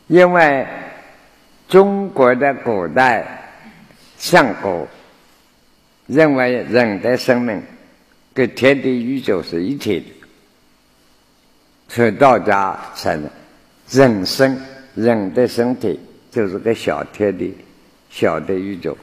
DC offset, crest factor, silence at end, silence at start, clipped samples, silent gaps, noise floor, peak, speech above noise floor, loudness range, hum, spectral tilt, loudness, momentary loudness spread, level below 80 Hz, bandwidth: under 0.1%; 18 dB; 0.1 s; 0.1 s; under 0.1%; none; -54 dBFS; 0 dBFS; 39 dB; 5 LU; none; -5.5 dB/octave; -16 LUFS; 15 LU; -54 dBFS; 15 kHz